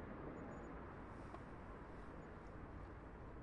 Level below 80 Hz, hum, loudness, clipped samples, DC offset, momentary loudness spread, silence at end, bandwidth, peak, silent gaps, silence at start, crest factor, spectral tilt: -60 dBFS; none; -55 LUFS; under 0.1%; under 0.1%; 4 LU; 0 s; 10.5 kHz; -38 dBFS; none; 0 s; 16 dB; -8 dB/octave